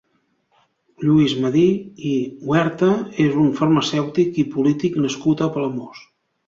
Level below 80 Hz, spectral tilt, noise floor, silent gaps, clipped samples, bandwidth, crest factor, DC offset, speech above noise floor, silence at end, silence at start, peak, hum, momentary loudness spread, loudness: -58 dBFS; -6.5 dB/octave; -66 dBFS; none; under 0.1%; 7.6 kHz; 16 dB; under 0.1%; 48 dB; 0.5 s; 1 s; -4 dBFS; none; 8 LU; -19 LUFS